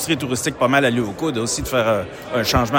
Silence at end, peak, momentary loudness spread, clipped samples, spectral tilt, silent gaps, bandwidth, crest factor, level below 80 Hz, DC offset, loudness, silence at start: 0 s; -4 dBFS; 6 LU; under 0.1%; -4 dB/octave; none; 17 kHz; 16 dB; -40 dBFS; under 0.1%; -20 LUFS; 0 s